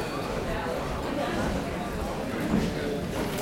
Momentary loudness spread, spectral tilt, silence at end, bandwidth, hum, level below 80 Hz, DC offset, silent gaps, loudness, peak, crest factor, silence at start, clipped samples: 5 LU; -5.5 dB/octave; 0 s; 16.5 kHz; none; -40 dBFS; under 0.1%; none; -30 LUFS; -12 dBFS; 18 dB; 0 s; under 0.1%